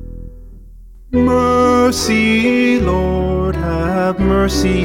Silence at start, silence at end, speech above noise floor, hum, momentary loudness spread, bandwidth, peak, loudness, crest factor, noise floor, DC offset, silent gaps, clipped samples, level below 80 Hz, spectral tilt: 0 s; 0 s; 23 dB; none; 6 LU; 16.5 kHz; -2 dBFS; -14 LUFS; 12 dB; -37 dBFS; 0.1%; none; under 0.1%; -26 dBFS; -5.5 dB/octave